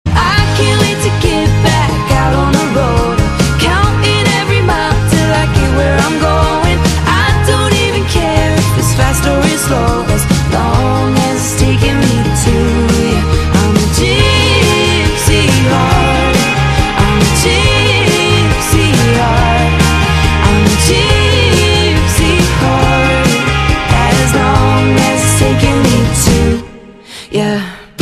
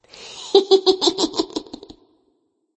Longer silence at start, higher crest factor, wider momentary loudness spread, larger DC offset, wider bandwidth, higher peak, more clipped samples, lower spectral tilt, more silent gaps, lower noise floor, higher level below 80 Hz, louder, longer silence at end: second, 0.05 s vs 0.2 s; second, 10 dB vs 20 dB; second, 3 LU vs 23 LU; neither; first, 14.5 kHz vs 8.6 kHz; about the same, 0 dBFS vs 0 dBFS; neither; first, -4.5 dB/octave vs -2.5 dB/octave; neither; second, -32 dBFS vs -67 dBFS; first, -18 dBFS vs -60 dBFS; first, -10 LUFS vs -18 LUFS; second, 0 s vs 1.15 s